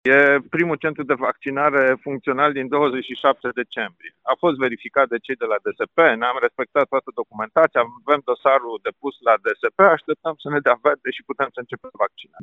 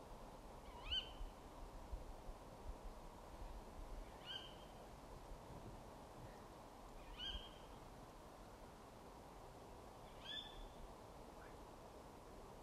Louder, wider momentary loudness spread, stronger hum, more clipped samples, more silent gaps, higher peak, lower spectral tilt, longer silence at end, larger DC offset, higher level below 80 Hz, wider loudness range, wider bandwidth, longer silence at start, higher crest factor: first, -20 LUFS vs -55 LUFS; about the same, 10 LU vs 10 LU; neither; neither; neither; first, 0 dBFS vs -32 dBFS; first, -7 dB/octave vs -4 dB/octave; about the same, 0 s vs 0 s; neither; second, -68 dBFS vs -60 dBFS; about the same, 2 LU vs 4 LU; second, 6.8 kHz vs 15 kHz; about the same, 0.05 s vs 0 s; about the same, 20 dB vs 22 dB